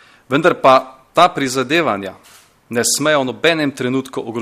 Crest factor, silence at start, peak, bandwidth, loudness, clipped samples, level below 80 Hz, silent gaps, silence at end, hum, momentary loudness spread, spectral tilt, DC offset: 16 dB; 0.3 s; 0 dBFS; 15.5 kHz; -16 LUFS; under 0.1%; -58 dBFS; none; 0 s; none; 10 LU; -3.5 dB/octave; under 0.1%